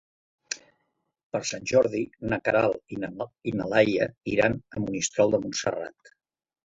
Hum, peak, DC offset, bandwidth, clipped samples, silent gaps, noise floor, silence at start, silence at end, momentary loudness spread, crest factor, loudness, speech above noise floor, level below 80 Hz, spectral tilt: none; -6 dBFS; under 0.1%; 8 kHz; under 0.1%; 1.23-1.30 s; -77 dBFS; 0.5 s; 0.75 s; 13 LU; 22 dB; -27 LUFS; 51 dB; -58 dBFS; -4.5 dB/octave